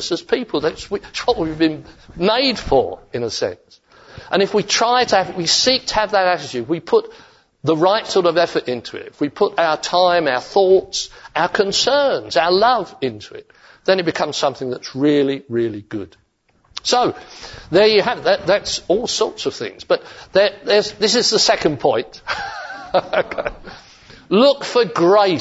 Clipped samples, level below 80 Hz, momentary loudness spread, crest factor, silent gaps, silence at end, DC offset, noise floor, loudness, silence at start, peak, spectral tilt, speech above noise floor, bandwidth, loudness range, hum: under 0.1%; -48 dBFS; 12 LU; 16 dB; none; 0 s; under 0.1%; -60 dBFS; -17 LUFS; 0 s; -2 dBFS; -3.5 dB/octave; 42 dB; 8 kHz; 4 LU; none